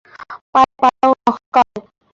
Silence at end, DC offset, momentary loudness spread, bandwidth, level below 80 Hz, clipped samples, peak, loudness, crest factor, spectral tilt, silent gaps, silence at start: 0.4 s; under 0.1%; 21 LU; 7.6 kHz; -54 dBFS; under 0.1%; -2 dBFS; -15 LUFS; 16 dB; -5 dB/octave; 0.41-0.53 s, 1.46-1.52 s; 0.3 s